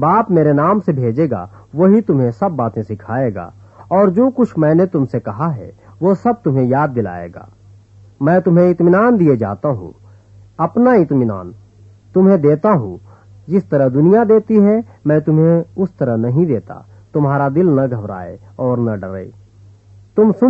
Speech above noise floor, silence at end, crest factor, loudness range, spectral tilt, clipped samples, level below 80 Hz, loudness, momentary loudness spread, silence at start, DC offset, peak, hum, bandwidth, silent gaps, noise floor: 30 dB; 0 s; 14 dB; 4 LU; -11.5 dB/octave; under 0.1%; -52 dBFS; -15 LUFS; 14 LU; 0 s; under 0.1%; -2 dBFS; none; 5.2 kHz; none; -44 dBFS